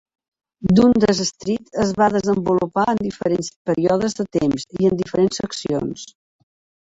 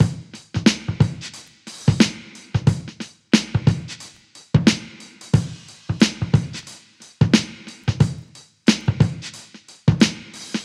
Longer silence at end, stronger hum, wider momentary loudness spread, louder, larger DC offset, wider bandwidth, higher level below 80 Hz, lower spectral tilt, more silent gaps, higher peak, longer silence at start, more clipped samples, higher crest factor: first, 0.8 s vs 0 s; neither; second, 10 LU vs 19 LU; about the same, -19 LUFS vs -20 LUFS; neither; second, 8.2 kHz vs 12.5 kHz; second, -48 dBFS vs -42 dBFS; about the same, -6 dB/octave vs -5.5 dB/octave; first, 3.56-3.65 s vs none; about the same, -2 dBFS vs 0 dBFS; first, 0.6 s vs 0 s; neither; about the same, 18 dB vs 20 dB